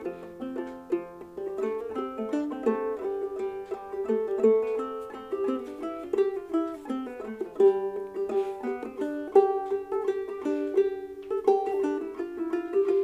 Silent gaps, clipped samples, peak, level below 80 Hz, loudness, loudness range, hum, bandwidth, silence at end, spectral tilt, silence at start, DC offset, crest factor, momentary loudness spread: none; under 0.1%; -8 dBFS; -66 dBFS; -29 LUFS; 5 LU; none; 8.2 kHz; 0 s; -6.5 dB/octave; 0 s; under 0.1%; 20 dB; 13 LU